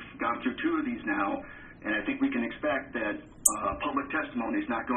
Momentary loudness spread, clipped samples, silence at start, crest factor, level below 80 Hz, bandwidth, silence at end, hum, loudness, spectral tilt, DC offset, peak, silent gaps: 8 LU; under 0.1%; 0 s; 30 dB; -56 dBFS; 7.6 kHz; 0 s; none; -30 LUFS; -3 dB/octave; under 0.1%; -2 dBFS; none